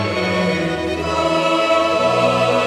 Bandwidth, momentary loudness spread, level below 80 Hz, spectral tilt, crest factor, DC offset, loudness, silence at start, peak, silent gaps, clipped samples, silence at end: 14 kHz; 5 LU; -42 dBFS; -5 dB/octave; 14 dB; under 0.1%; -17 LUFS; 0 s; -4 dBFS; none; under 0.1%; 0 s